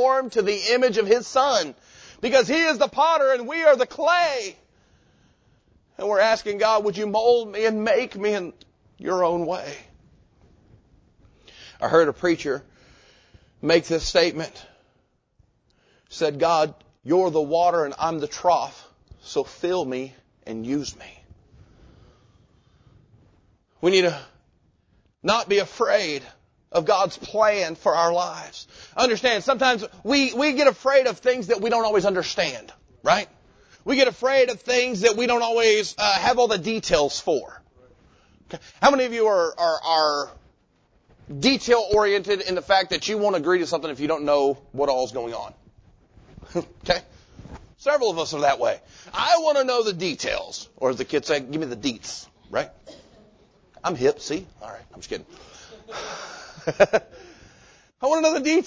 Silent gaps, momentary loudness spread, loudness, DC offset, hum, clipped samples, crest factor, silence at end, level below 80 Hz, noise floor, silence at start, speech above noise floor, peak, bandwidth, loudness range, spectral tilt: none; 15 LU; -22 LUFS; under 0.1%; none; under 0.1%; 22 dB; 0 s; -54 dBFS; -67 dBFS; 0 s; 45 dB; -2 dBFS; 8 kHz; 8 LU; -3.5 dB/octave